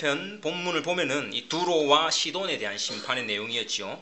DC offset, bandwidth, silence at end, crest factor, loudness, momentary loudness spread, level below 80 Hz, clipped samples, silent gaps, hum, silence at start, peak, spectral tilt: under 0.1%; 8.4 kHz; 0 s; 20 dB; -26 LUFS; 9 LU; -82 dBFS; under 0.1%; none; none; 0 s; -8 dBFS; -2.5 dB/octave